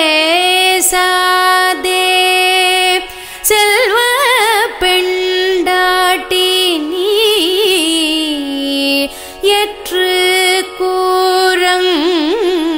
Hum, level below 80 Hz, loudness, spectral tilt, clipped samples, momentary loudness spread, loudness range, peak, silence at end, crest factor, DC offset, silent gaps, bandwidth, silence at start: none; -44 dBFS; -11 LUFS; 0 dB/octave; under 0.1%; 6 LU; 2 LU; 0 dBFS; 0 s; 12 dB; under 0.1%; none; 16.5 kHz; 0 s